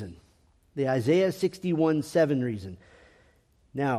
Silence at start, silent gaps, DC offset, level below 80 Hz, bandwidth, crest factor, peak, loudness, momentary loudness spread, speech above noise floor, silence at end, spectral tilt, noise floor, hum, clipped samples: 0 s; none; under 0.1%; -64 dBFS; 14.5 kHz; 16 dB; -12 dBFS; -26 LUFS; 17 LU; 38 dB; 0 s; -7 dB/octave; -63 dBFS; none; under 0.1%